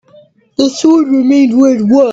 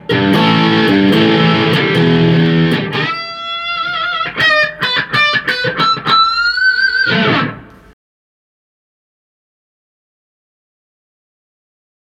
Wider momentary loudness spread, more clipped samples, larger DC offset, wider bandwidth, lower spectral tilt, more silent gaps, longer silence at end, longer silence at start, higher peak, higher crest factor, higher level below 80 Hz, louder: about the same, 6 LU vs 7 LU; neither; neither; second, 7.8 kHz vs 13 kHz; about the same, -5.5 dB/octave vs -6 dB/octave; neither; second, 0 s vs 4.5 s; first, 0.6 s vs 0.05 s; about the same, 0 dBFS vs -2 dBFS; about the same, 10 dB vs 12 dB; second, -54 dBFS vs -48 dBFS; first, -9 LUFS vs -12 LUFS